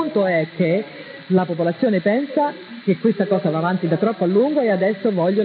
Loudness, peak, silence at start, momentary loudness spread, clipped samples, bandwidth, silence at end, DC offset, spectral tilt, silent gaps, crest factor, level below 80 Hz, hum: -19 LUFS; -4 dBFS; 0 s; 5 LU; under 0.1%; 4.9 kHz; 0 s; under 0.1%; -12 dB/octave; none; 14 dB; -70 dBFS; none